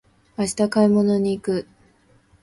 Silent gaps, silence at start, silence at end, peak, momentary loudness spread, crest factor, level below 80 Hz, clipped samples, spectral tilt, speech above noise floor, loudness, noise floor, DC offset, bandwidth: none; 0.4 s; 0.8 s; -6 dBFS; 10 LU; 16 dB; -56 dBFS; under 0.1%; -6 dB/octave; 38 dB; -21 LUFS; -57 dBFS; under 0.1%; 11.5 kHz